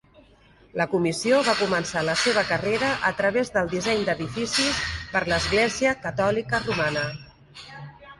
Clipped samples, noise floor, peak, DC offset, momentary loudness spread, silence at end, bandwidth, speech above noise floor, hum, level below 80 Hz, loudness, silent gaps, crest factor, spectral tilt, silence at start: under 0.1%; -55 dBFS; -8 dBFS; under 0.1%; 10 LU; 0.05 s; 11.5 kHz; 31 dB; none; -48 dBFS; -23 LUFS; none; 16 dB; -3.5 dB/octave; 0.75 s